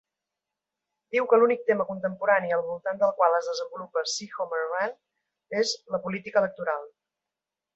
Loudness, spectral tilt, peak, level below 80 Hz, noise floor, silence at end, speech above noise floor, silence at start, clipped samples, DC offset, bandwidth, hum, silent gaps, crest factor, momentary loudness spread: -26 LUFS; -3.5 dB/octave; -8 dBFS; -76 dBFS; -88 dBFS; 0.9 s; 62 dB; 1.1 s; under 0.1%; under 0.1%; 8.2 kHz; none; none; 20 dB; 10 LU